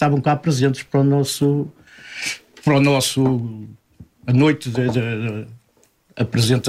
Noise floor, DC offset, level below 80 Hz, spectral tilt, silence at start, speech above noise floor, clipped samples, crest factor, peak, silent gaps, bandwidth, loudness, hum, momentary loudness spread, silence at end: -59 dBFS; under 0.1%; -54 dBFS; -5.5 dB/octave; 0 s; 41 dB; under 0.1%; 14 dB; -4 dBFS; none; 15.5 kHz; -19 LUFS; none; 15 LU; 0 s